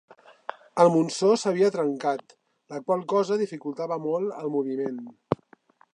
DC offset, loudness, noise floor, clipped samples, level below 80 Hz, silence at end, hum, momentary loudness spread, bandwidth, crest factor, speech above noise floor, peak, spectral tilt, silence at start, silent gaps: under 0.1%; -26 LUFS; -59 dBFS; under 0.1%; -72 dBFS; 0.6 s; none; 15 LU; 10.5 kHz; 22 dB; 34 dB; -4 dBFS; -6 dB/octave; 0.5 s; none